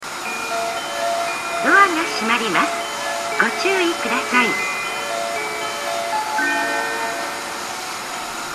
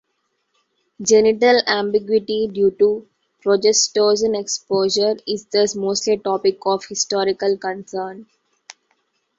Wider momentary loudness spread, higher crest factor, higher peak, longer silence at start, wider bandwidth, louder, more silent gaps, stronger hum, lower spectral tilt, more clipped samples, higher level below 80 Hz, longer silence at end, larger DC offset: about the same, 10 LU vs 10 LU; about the same, 20 dB vs 18 dB; about the same, 0 dBFS vs -2 dBFS; second, 0 s vs 1 s; first, 15.5 kHz vs 7.8 kHz; about the same, -20 LUFS vs -18 LUFS; neither; neither; about the same, -1.5 dB/octave vs -2.5 dB/octave; neither; about the same, -60 dBFS vs -62 dBFS; second, 0 s vs 1.15 s; neither